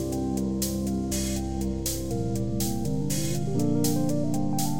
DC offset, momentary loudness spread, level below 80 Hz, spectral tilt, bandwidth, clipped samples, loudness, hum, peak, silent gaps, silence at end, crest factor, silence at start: 1%; 4 LU; -40 dBFS; -5.5 dB/octave; 17 kHz; under 0.1%; -28 LUFS; none; -10 dBFS; none; 0 s; 16 dB; 0 s